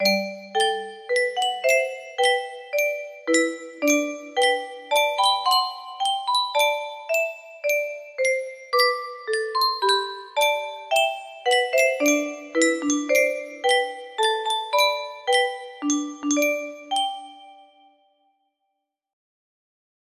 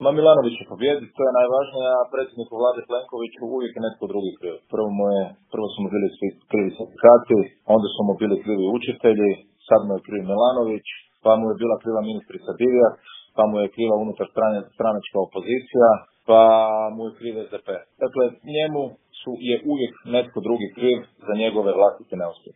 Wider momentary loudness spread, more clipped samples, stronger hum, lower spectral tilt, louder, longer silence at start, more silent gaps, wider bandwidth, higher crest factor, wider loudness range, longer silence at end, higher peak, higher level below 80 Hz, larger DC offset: second, 8 LU vs 14 LU; neither; neither; second, -1 dB/octave vs -10.5 dB/octave; about the same, -23 LUFS vs -21 LUFS; about the same, 0 s vs 0 s; neither; first, 15.5 kHz vs 3.8 kHz; about the same, 18 dB vs 20 dB; second, 4 LU vs 7 LU; first, 2.6 s vs 0.25 s; second, -6 dBFS vs 0 dBFS; second, -74 dBFS vs -68 dBFS; neither